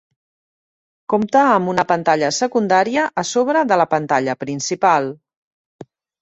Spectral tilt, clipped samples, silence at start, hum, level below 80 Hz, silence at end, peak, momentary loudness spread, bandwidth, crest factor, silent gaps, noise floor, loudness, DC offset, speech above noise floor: -4.5 dB/octave; under 0.1%; 1.1 s; none; -62 dBFS; 0.4 s; -2 dBFS; 8 LU; 8.2 kHz; 18 dB; 5.37-5.79 s; under -90 dBFS; -17 LUFS; under 0.1%; over 73 dB